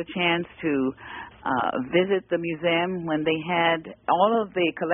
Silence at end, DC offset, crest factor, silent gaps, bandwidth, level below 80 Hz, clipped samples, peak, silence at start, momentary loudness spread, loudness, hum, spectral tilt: 0 s; under 0.1%; 18 dB; none; 3.7 kHz; -60 dBFS; under 0.1%; -6 dBFS; 0 s; 6 LU; -24 LUFS; none; -1.5 dB/octave